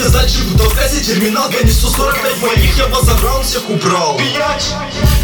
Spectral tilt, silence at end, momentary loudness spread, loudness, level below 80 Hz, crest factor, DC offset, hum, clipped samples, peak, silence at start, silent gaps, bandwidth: -4 dB/octave; 0 s; 3 LU; -13 LUFS; -16 dBFS; 12 dB; under 0.1%; none; under 0.1%; 0 dBFS; 0 s; none; 20 kHz